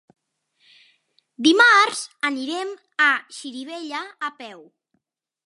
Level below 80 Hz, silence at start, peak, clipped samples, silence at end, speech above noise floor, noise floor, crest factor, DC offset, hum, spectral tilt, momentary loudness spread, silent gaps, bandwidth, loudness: -82 dBFS; 1.4 s; -4 dBFS; under 0.1%; 0.85 s; 57 dB; -78 dBFS; 20 dB; under 0.1%; none; -1 dB/octave; 20 LU; none; 11.5 kHz; -19 LUFS